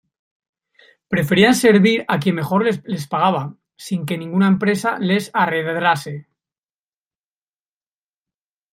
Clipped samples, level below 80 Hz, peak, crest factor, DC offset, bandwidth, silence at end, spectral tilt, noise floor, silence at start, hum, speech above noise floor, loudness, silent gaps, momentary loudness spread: under 0.1%; -58 dBFS; -2 dBFS; 18 dB; under 0.1%; 16 kHz; 2.5 s; -5.5 dB/octave; under -90 dBFS; 1.1 s; none; over 73 dB; -18 LUFS; none; 13 LU